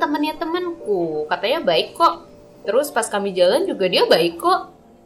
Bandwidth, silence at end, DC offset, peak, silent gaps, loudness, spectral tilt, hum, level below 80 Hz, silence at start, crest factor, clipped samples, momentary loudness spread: 17 kHz; 0.35 s; under 0.1%; -4 dBFS; none; -19 LUFS; -3.5 dB/octave; none; -56 dBFS; 0 s; 16 dB; under 0.1%; 8 LU